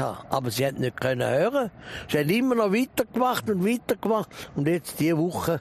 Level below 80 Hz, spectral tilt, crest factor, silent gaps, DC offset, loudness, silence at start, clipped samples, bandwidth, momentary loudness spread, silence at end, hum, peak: -56 dBFS; -5.5 dB/octave; 18 dB; none; under 0.1%; -25 LUFS; 0 s; under 0.1%; 15.5 kHz; 6 LU; 0 s; none; -6 dBFS